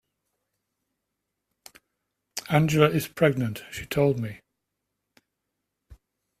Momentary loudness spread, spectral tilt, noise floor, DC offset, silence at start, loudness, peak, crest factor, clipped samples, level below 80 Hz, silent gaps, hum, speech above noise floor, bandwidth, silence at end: 16 LU; -6 dB/octave; -82 dBFS; under 0.1%; 2.35 s; -24 LUFS; -4 dBFS; 24 dB; under 0.1%; -58 dBFS; none; none; 59 dB; 16 kHz; 0.45 s